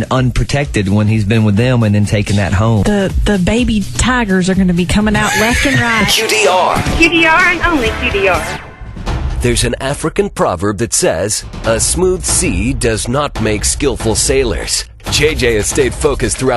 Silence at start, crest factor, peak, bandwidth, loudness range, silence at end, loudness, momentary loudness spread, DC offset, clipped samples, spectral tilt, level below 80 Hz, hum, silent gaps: 0 s; 12 dB; 0 dBFS; 13 kHz; 5 LU; 0 s; -12 LUFS; 6 LU; under 0.1%; under 0.1%; -4 dB/octave; -24 dBFS; none; none